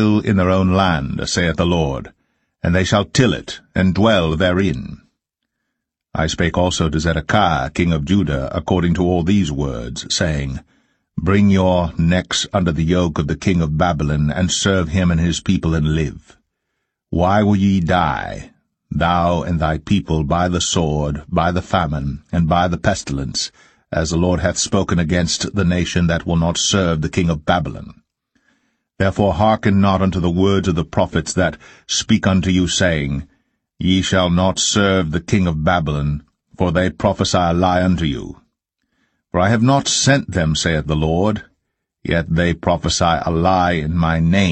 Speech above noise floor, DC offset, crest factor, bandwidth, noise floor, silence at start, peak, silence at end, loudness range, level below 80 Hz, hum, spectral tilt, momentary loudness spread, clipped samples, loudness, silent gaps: 61 dB; under 0.1%; 16 dB; 9 kHz; -77 dBFS; 0 s; 0 dBFS; 0 s; 2 LU; -36 dBFS; none; -5 dB/octave; 8 LU; under 0.1%; -17 LUFS; none